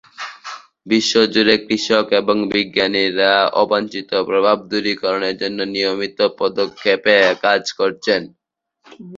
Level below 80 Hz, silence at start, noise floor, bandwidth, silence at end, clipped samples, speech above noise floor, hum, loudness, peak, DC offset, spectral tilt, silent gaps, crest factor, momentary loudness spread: -60 dBFS; 0.2 s; -54 dBFS; 7.8 kHz; 0 s; under 0.1%; 37 dB; none; -17 LUFS; 0 dBFS; under 0.1%; -3.5 dB/octave; none; 18 dB; 8 LU